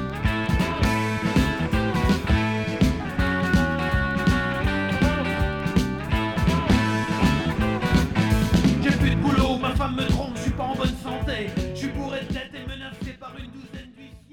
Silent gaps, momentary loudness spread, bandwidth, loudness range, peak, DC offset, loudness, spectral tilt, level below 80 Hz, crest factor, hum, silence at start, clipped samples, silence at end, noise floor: none; 12 LU; 18.5 kHz; 7 LU; -6 dBFS; under 0.1%; -23 LUFS; -6 dB/octave; -30 dBFS; 16 dB; none; 0 s; under 0.1%; 0.15 s; -45 dBFS